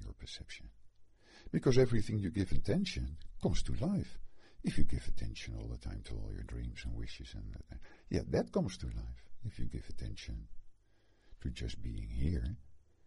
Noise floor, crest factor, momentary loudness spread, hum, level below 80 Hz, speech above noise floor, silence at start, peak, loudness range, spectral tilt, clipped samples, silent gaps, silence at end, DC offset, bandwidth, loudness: -67 dBFS; 20 dB; 15 LU; none; -44 dBFS; 33 dB; 0 s; -14 dBFS; 9 LU; -6.5 dB/octave; under 0.1%; none; 0.3 s; under 0.1%; 11 kHz; -39 LUFS